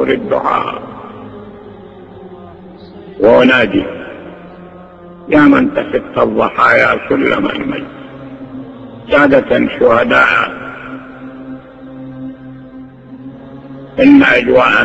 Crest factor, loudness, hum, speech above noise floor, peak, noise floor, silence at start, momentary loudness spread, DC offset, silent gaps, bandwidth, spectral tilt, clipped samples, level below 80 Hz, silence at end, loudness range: 14 dB; -10 LUFS; none; 24 dB; 0 dBFS; -34 dBFS; 0 s; 25 LU; under 0.1%; none; 8 kHz; -6.5 dB/octave; under 0.1%; -44 dBFS; 0 s; 7 LU